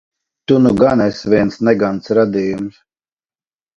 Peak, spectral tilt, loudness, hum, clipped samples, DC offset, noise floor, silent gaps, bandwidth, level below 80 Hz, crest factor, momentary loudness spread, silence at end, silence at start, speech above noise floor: 0 dBFS; -7.5 dB/octave; -14 LUFS; none; under 0.1%; under 0.1%; under -90 dBFS; none; 7.8 kHz; -46 dBFS; 16 dB; 11 LU; 1.05 s; 0.5 s; over 76 dB